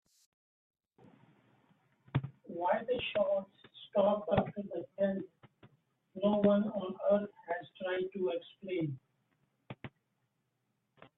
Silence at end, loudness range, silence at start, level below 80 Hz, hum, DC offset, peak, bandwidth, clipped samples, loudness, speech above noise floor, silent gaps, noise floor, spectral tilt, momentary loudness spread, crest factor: 0.1 s; 7 LU; 2.15 s; -70 dBFS; none; under 0.1%; -16 dBFS; 4 kHz; under 0.1%; -34 LUFS; 48 dB; none; -82 dBFS; -9 dB/octave; 20 LU; 22 dB